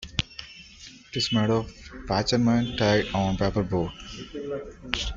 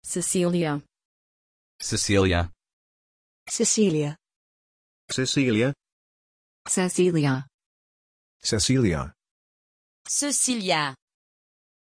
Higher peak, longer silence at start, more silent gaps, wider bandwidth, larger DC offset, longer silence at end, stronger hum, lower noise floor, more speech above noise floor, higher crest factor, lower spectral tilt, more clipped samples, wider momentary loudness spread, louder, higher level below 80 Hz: first, -2 dBFS vs -8 dBFS; about the same, 0 s vs 0.05 s; second, none vs 1.05-1.79 s, 2.73-3.46 s, 4.36-5.08 s, 5.92-6.65 s, 7.54-7.58 s, 7.66-8.40 s, 9.31-10.05 s; second, 7.8 kHz vs 11 kHz; neither; second, 0 s vs 0.9 s; neither; second, -48 dBFS vs under -90 dBFS; second, 22 dB vs over 67 dB; first, 24 dB vs 18 dB; first, -5.5 dB/octave vs -4 dB/octave; neither; first, 18 LU vs 11 LU; about the same, -26 LUFS vs -24 LUFS; first, -44 dBFS vs -50 dBFS